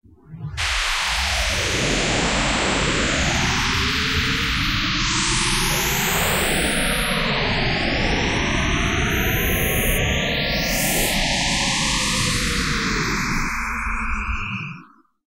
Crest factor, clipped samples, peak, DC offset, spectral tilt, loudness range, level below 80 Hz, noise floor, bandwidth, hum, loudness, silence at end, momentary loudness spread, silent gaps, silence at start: 14 dB; under 0.1%; -8 dBFS; 0.3%; -3 dB/octave; 1 LU; -30 dBFS; -46 dBFS; 16 kHz; none; -20 LUFS; 0.5 s; 5 LU; none; 0.25 s